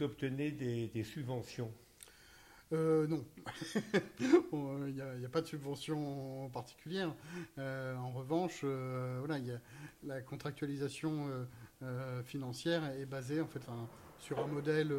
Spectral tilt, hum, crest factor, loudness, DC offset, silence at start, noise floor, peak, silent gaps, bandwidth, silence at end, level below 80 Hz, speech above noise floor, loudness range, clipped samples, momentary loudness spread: -6.5 dB/octave; none; 24 dB; -39 LUFS; under 0.1%; 0 s; -61 dBFS; -16 dBFS; none; 16.5 kHz; 0 s; -70 dBFS; 22 dB; 6 LU; under 0.1%; 14 LU